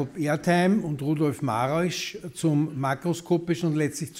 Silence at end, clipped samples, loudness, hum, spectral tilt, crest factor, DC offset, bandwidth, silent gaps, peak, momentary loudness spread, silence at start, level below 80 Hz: 0 s; under 0.1%; -26 LUFS; none; -6 dB/octave; 16 dB; under 0.1%; 16 kHz; none; -10 dBFS; 6 LU; 0 s; -62 dBFS